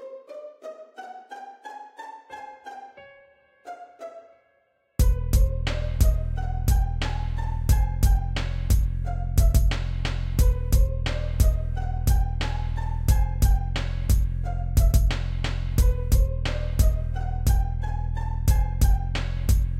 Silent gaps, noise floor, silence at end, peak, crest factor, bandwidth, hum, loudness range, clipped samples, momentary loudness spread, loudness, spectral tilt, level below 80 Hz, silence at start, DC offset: none; -67 dBFS; 0 s; -8 dBFS; 16 dB; 16 kHz; none; 17 LU; under 0.1%; 18 LU; -25 LUFS; -5.5 dB/octave; -24 dBFS; 0 s; under 0.1%